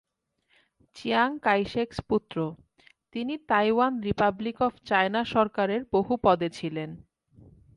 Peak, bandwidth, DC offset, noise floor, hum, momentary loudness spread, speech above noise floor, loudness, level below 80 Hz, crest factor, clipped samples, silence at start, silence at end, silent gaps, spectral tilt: -8 dBFS; 11.5 kHz; under 0.1%; -73 dBFS; none; 10 LU; 47 dB; -26 LUFS; -56 dBFS; 20 dB; under 0.1%; 0.95 s; 0.75 s; none; -6.5 dB/octave